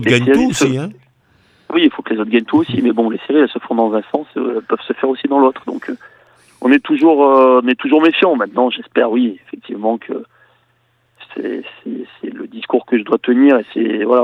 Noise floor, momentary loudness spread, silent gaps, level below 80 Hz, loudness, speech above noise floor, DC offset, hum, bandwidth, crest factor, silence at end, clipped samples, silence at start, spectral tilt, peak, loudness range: -60 dBFS; 17 LU; none; -56 dBFS; -14 LUFS; 45 dB; under 0.1%; none; 10.5 kHz; 14 dB; 0 s; under 0.1%; 0 s; -5.5 dB/octave; 0 dBFS; 9 LU